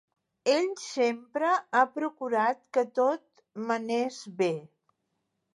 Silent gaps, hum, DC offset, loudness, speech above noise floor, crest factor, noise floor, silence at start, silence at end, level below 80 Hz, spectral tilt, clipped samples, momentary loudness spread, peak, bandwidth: none; none; under 0.1%; -29 LUFS; 52 dB; 20 dB; -80 dBFS; 0.45 s; 0.9 s; -86 dBFS; -4 dB/octave; under 0.1%; 8 LU; -10 dBFS; 11.5 kHz